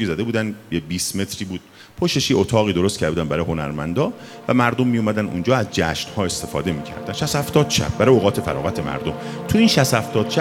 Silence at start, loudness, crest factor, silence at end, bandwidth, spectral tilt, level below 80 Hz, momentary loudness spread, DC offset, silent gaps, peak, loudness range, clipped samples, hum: 0 s; -20 LUFS; 18 dB; 0 s; 17 kHz; -5 dB/octave; -44 dBFS; 10 LU; under 0.1%; none; -2 dBFS; 3 LU; under 0.1%; none